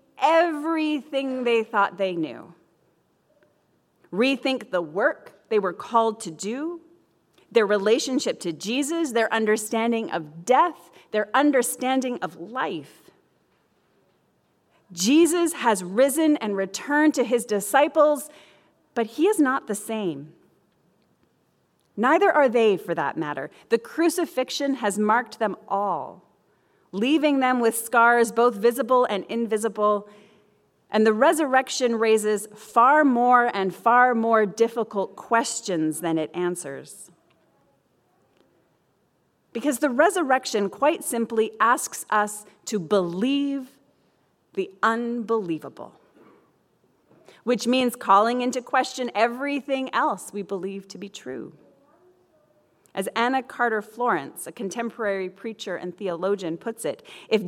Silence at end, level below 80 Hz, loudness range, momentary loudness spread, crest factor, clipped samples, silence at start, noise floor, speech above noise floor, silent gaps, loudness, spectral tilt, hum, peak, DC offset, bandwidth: 0 s; -78 dBFS; 8 LU; 13 LU; 20 dB; under 0.1%; 0.2 s; -67 dBFS; 45 dB; none; -23 LUFS; -4 dB/octave; none; -4 dBFS; under 0.1%; 17 kHz